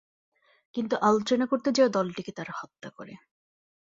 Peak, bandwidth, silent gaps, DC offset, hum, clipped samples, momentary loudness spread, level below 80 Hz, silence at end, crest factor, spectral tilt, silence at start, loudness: -8 dBFS; 7.8 kHz; none; under 0.1%; none; under 0.1%; 20 LU; -72 dBFS; 0.7 s; 20 dB; -5 dB/octave; 0.75 s; -27 LUFS